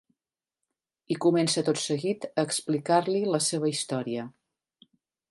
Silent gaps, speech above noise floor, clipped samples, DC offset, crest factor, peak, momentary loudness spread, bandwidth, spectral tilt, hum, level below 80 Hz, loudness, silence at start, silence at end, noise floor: none; over 63 dB; under 0.1%; under 0.1%; 20 dB; -8 dBFS; 9 LU; 11.5 kHz; -4.5 dB/octave; none; -76 dBFS; -27 LUFS; 1.1 s; 1 s; under -90 dBFS